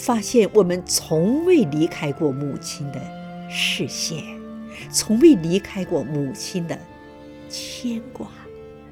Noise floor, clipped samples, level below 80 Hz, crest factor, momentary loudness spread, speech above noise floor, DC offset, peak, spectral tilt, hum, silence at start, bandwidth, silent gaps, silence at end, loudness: -41 dBFS; under 0.1%; -54 dBFS; 20 dB; 19 LU; 21 dB; under 0.1%; -2 dBFS; -4.5 dB/octave; none; 0 s; 17 kHz; none; 0 s; -21 LUFS